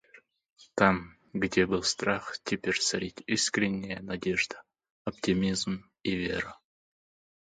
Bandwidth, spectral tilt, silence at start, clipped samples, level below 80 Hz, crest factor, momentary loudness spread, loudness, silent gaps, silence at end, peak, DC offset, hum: 9.6 kHz; -3.5 dB/octave; 0.15 s; under 0.1%; -56 dBFS; 24 dB; 11 LU; -30 LUFS; 4.90-5.05 s; 0.85 s; -6 dBFS; under 0.1%; none